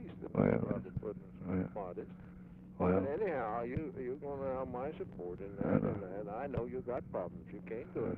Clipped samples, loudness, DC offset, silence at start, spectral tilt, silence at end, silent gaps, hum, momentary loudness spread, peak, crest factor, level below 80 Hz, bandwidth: under 0.1%; -38 LUFS; under 0.1%; 0 s; -11 dB/octave; 0 s; none; none; 13 LU; -14 dBFS; 24 dB; -58 dBFS; 4.2 kHz